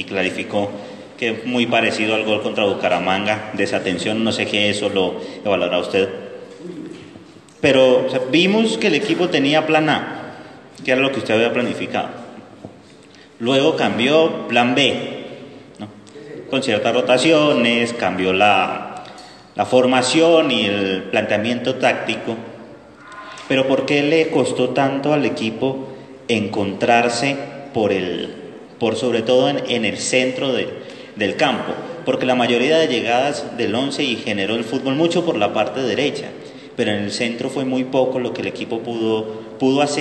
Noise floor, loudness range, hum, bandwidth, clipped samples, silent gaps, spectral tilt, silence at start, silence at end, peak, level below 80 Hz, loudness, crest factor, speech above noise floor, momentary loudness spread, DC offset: -44 dBFS; 4 LU; none; 9.8 kHz; under 0.1%; none; -4.5 dB/octave; 0 s; 0 s; 0 dBFS; -64 dBFS; -18 LUFS; 18 dB; 27 dB; 18 LU; under 0.1%